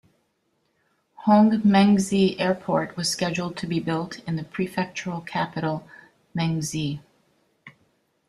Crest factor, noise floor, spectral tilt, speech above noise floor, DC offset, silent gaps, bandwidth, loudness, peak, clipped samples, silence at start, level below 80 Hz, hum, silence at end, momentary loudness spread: 20 dB; -71 dBFS; -5.5 dB/octave; 48 dB; under 0.1%; none; 13 kHz; -24 LUFS; -4 dBFS; under 0.1%; 1.2 s; -60 dBFS; none; 0.6 s; 13 LU